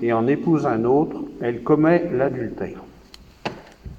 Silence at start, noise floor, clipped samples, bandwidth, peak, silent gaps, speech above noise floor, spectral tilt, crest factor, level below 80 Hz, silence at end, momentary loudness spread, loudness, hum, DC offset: 0 s; -47 dBFS; under 0.1%; 7.6 kHz; -4 dBFS; none; 27 dB; -8.5 dB/octave; 18 dB; -50 dBFS; 0 s; 15 LU; -21 LUFS; none; under 0.1%